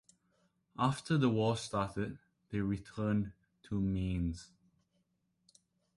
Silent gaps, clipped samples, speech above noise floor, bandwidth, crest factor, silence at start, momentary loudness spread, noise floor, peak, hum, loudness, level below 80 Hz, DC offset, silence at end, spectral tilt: none; under 0.1%; 45 dB; 11.5 kHz; 20 dB; 0.8 s; 12 LU; -79 dBFS; -16 dBFS; none; -36 LUFS; -54 dBFS; under 0.1%; 1.5 s; -6.5 dB/octave